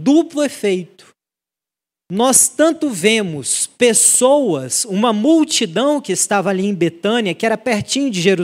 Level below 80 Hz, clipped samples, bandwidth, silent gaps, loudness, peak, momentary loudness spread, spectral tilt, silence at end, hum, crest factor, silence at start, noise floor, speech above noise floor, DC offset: -64 dBFS; under 0.1%; 16 kHz; none; -15 LUFS; 0 dBFS; 8 LU; -3 dB/octave; 0 s; none; 16 dB; 0 s; -87 dBFS; 72 dB; under 0.1%